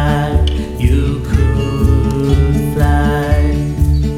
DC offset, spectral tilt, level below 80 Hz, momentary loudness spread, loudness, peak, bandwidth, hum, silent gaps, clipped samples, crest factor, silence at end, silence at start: under 0.1%; -7.5 dB/octave; -16 dBFS; 3 LU; -14 LUFS; 0 dBFS; 14.5 kHz; none; none; under 0.1%; 12 dB; 0 s; 0 s